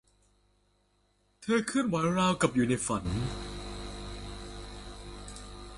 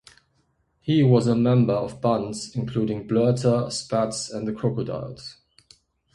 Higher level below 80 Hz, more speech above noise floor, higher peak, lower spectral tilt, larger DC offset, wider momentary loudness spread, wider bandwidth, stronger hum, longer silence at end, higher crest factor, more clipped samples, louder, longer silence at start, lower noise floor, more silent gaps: first, -48 dBFS vs -56 dBFS; second, 42 dB vs 46 dB; second, -12 dBFS vs -6 dBFS; second, -5 dB/octave vs -7 dB/octave; neither; first, 18 LU vs 13 LU; about the same, 11.5 kHz vs 11.5 kHz; first, 50 Hz at -45 dBFS vs none; second, 0 s vs 0.85 s; about the same, 20 dB vs 18 dB; neither; second, -30 LUFS vs -23 LUFS; first, 1.4 s vs 0.85 s; about the same, -71 dBFS vs -68 dBFS; neither